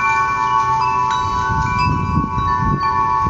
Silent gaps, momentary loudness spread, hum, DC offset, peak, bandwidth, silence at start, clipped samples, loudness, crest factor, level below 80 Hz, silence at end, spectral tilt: none; 3 LU; none; under 0.1%; -4 dBFS; 8.2 kHz; 0 s; under 0.1%; -17 LUFS; 14 dB; -30 dBFS; 0 s; -5.5 dB/octave